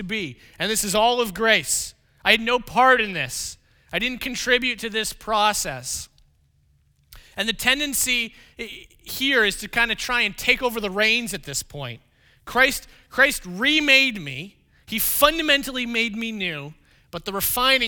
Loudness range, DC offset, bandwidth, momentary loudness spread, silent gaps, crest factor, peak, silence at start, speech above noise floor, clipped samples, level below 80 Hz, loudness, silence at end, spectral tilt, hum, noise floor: 5 LU; under 0.1%; over 20 kHz; 16 LU; none; 24 dB; 0 dBFS; 0 s; 39 dB; under 0.1%; -48 dBFS; -21 LUFS; 0 s; -1.5 dB/octave; none; -62 dBFS